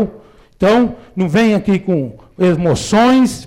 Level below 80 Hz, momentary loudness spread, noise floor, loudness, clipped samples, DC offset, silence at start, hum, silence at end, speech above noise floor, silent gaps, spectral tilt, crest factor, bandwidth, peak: -42 dBFS; 9 LU; -41 dBFS; -14 LUFS; under 0.1%; under 0.1%; 0 s; none; 0 s; 28 dB; none; -6 dB/octave; 8 dB; 14.5 kHz; -6 dBFS